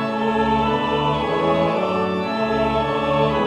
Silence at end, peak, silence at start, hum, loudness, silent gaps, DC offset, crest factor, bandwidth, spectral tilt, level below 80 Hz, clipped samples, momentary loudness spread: 0 s; -6 dBFS; 0 s; none; -20 LUFS; none; under 0.1%; 14 dB; 10.5 kHz; -7 dB/octave; -40 dBFS; under 0.1%; 3 LU